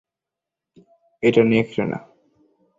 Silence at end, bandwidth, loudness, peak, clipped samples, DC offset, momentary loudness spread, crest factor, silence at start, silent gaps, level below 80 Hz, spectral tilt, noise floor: 0.8 s; 7.6 kHz; -19 LUFS; -2 dBFS; under 0.1%; under 0.1%; 11 LU; 20 dB; 1.2 s; none; -58 dBFS; -7.5 dB/octave; -86 dBFS